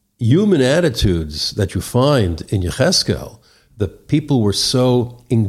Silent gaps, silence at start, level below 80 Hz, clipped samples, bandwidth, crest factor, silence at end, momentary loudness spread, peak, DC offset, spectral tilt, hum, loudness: none; 0.2 s; -34 dBFS; under 0.1%; 15 kHz; 14 dB; 0 s; 8 LU; -2 dBFS; under 0.1%; -5.5 dB/octave; none; -17 LUFS